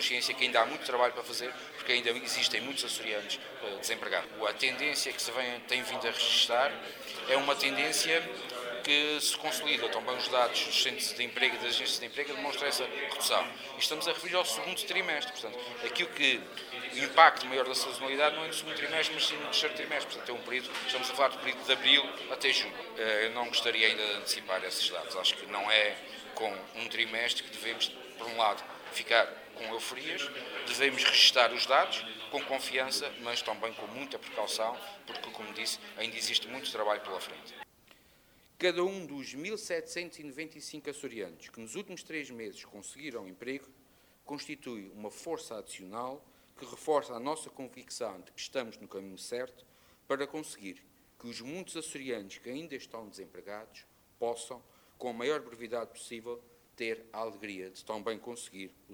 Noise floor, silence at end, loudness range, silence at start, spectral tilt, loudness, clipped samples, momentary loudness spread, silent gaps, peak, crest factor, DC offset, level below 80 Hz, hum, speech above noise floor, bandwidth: -64 dBFS; 0 s; 14 LU; 0 s; -1 dB/octave; -31 LUFS; under 0.1%; 17 LU; none; -6 dBFS; 28 dB; under 0.1%; -76 dBFS; none; 31 dB; over 20 kHz